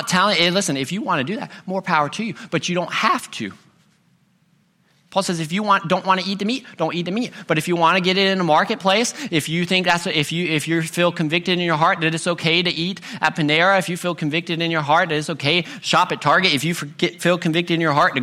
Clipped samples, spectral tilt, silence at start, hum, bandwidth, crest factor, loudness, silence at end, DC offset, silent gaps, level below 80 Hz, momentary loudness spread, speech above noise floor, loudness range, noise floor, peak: under 0.1%; -4 dB/octave; 0 s; none; 15.5 kHz; 20 dB; -19 LUFS; 0 s; under 0.1%; none; -62 dBFS; 8 LU; 41 dB; 5 LU; -61 dBFS; 0 dBFS